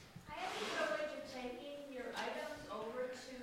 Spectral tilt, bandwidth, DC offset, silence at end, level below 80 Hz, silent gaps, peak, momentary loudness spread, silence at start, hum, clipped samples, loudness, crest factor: -3 dB/octave; 16 kHz; under 0.1%; 0 s; -72 dBFS; none; -28 dBFS; 9 LU; 0 s; none; under 0.1%; -44 LUFS; 18 dB